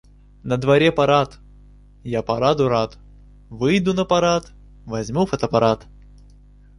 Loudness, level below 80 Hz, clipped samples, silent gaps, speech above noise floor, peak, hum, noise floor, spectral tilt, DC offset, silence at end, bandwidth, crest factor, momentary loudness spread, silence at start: -20 LUFS; -46 dBFS; under 0.1%; none; 28 dB; -2 dBFS; 50 Hz at -45 dBFS; -47 dBFS; -6 dB/octave; under 0.1%; 0.95 s; 11.5 kHz; 18 dB; 13 LU; 0.45 s